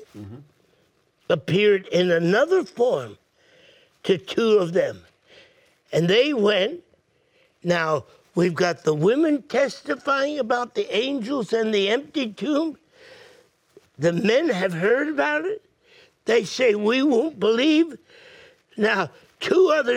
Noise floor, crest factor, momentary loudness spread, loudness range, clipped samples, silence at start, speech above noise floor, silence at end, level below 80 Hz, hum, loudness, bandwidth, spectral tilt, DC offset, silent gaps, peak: -64 dBFS; 16 dB; 10 LU; 3 LU; under 0.1%; 0 s; 43 dB; 0 s; -70 dBFS; none; -22 LUFS; 13 kHz; -5.5 dB/octave; under 0.1%; none; -6 dBFS